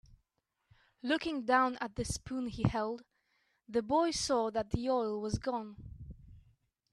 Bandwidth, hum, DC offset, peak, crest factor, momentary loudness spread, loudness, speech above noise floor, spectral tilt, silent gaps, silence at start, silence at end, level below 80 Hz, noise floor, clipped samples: 12.5 kHz; none; under 0.1%; -16 dBFS; 20 dB; 17 LU; -34 LUFS; 49 dB; -5 dB/octave; none; 1.05 s; 0.55 s; -54 dBFS; -83 dBFS; under 0.1%